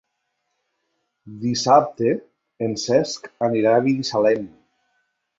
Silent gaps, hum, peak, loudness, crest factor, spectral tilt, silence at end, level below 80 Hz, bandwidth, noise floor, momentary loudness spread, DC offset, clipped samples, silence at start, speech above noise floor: none; none; -2 dBFS; -20 LUFS; 20 dB; -5 dB/octave; 0.9 s; -64 dBFS; 7.8 kHz; -75 dBFS; 12 LU; under 0.1%; under 0.1%; 1.25 s; 55 dB